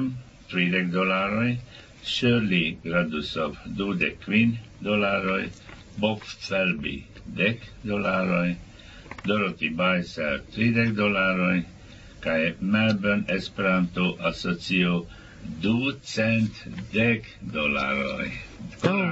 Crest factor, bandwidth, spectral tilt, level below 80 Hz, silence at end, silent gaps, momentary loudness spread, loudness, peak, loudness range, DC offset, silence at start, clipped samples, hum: 18 dB; 8 kHz; -6.5 dB/octave; -50 dBFS; 0 s; none; 12 LU; -25 LUFS; -8 dBFS; 3 LU; under 0.1%; 0 s; under 0.1%; none